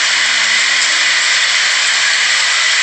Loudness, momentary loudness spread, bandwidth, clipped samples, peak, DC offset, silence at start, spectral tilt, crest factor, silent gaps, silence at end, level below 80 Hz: -10 LUFS; 0 LU; 10 kHz; under 0.1%; -2 dBFS; under 0.1%; 0 s; 3.5 dB/octave; 12 dB; none; 0 s; -72 dBFS